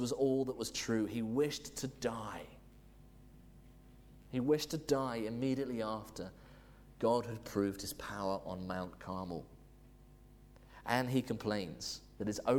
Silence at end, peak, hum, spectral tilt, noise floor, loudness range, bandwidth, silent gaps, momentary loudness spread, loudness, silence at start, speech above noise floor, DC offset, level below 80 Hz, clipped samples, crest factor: 0 s; -18 dBFS; 50 Hz at -60 dBFS; -5 dB/octave; -59 dBFS; 4 LU; 20 kHz; none; 13 LU; -38 LUFS; 0 s; 23 dB; under 0.1%; -62 dBFS; under 0.1%; 20 dB